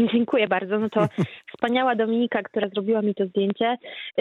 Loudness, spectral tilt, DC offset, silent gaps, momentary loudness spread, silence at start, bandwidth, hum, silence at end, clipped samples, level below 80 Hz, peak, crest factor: -24 LUFS; -7.5 dB/octave; under 0.1%; none; 7 LU; 0 s; 6.8 kHz; none; 0 s; under 0.1%; -70 dBFS; -6 dBFS; 16 dB